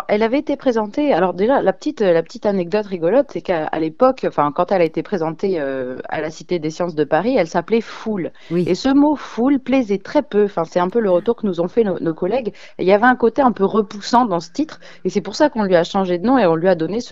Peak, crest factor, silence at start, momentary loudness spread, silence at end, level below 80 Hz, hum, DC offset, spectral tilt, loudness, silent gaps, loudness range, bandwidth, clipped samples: 0 dBFS; 18 dB; 0 s; 8 LU; 0 s; -52 dBFS; none; 0.9%; -6.5 dB/octave; -18 LUFS; none; 3 LU; 7.8 kHz; under 0.1%